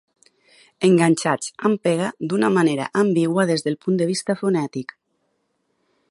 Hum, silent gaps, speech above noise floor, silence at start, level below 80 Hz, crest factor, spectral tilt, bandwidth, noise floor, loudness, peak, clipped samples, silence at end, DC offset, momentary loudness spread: none; none; 51 dB; 0.8 s; -70 dBFS; 18 dB; -5.5 dB/octave; 11.5 kHz; -70 dBFS; -20 LUFS; -2 dBFS; under 0.1%; 1.25 s; under 0.1%; 7 LU